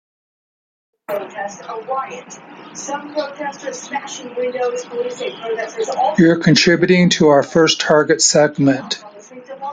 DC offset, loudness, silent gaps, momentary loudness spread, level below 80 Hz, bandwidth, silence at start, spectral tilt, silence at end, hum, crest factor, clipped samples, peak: under 0.1%; -16 LUFS; none; 18 LU; -56 dBFS; 15 kHz; 1.1 s; -4 dB/octave; 0 s; none; 16 dB; under 0.1%; 0 dBFS